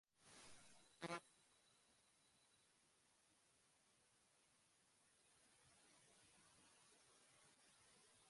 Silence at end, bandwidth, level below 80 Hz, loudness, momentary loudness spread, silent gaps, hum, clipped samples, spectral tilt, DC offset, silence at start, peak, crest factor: 0 s; 11.5 kHz; under -90 dBFS; -57 LUFS; 15 LU; none; none; under 0.1%; -3 dB/octave; under 0.1%; 0.1 s; -38 dBFS; 28 dB